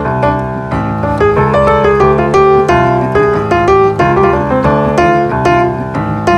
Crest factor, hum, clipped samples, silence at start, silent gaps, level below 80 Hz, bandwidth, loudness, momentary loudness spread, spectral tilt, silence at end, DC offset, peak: 10 dB; none; under 0.1%; 0 s; none; -28 dBFS; 9.8 kHz; -10 LUFS; 6 LU; -7.5 dB/octave; 0 s; under 0.1%; 0 dBFS